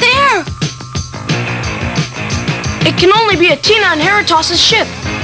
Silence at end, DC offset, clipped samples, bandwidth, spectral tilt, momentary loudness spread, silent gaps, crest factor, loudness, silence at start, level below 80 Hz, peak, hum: 0 s; 0.1%; under 0.1%; 8 kHz; -3.5 dB/octave; 11 LU; none; 12 dB; -11 LUFS; 0 s; -32 dBFS; 0 dBFS; none